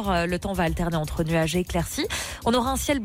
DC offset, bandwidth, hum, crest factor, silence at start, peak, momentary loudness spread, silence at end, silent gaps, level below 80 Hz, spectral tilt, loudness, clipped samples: under 0.1%; 16.5 kHz; none; 12 dB; 0 s; -12 dBFS; 4 LU; 0 s; none; -36 dBFS; -5 dB/octave; -25 LUFS; under 0.1%